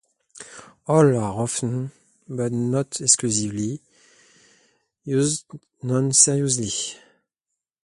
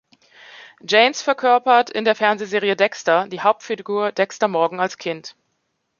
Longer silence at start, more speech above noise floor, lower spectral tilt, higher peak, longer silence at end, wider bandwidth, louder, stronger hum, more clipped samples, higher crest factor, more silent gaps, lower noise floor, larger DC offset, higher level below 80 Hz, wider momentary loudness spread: second, 0.35 s vs 0.6 s; first, 62 dB vs 53 dB; about the same, -4 dB/octave vs -3.5 dB/octave; about the same, 0 dBFS vs -2 dBFS; first, 0.85 s vs 0.7 s; first, 11.5 kHz vs 7.2 kHz; about the same, -21 LUFS vs -19 LUFS; neither; neither; first, 24 dB vs 18 dB; neither; first, -84 dBFS vs -72 dBFS; neither; first, -60 dBFS vs -74 dBFS; first, 21 LU vs 11 LU